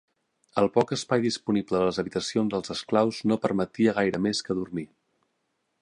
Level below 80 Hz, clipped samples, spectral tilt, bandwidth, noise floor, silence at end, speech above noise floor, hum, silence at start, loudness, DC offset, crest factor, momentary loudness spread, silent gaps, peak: -60 dBFS; under 0.1%; -5.5 dB/octave; 11 kHz; -76 dBFS; 0.95 s; 51 dB; none; 0.55 s; -26 LUFS; under 0.1%; 20 dB; 7 LU; none; -8 dBFS